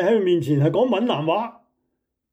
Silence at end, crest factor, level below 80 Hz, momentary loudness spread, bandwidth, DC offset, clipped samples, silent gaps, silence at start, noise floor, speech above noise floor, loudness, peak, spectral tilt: 0.8 s; 14 dB; -68 dBFS; 6 LU; 15.5 kHz; under 0.1%; under 0.1%; none; 0 s; -76 dBFS; 57 dB; -20 LUFS; -8 dBFS; -8 dB/octave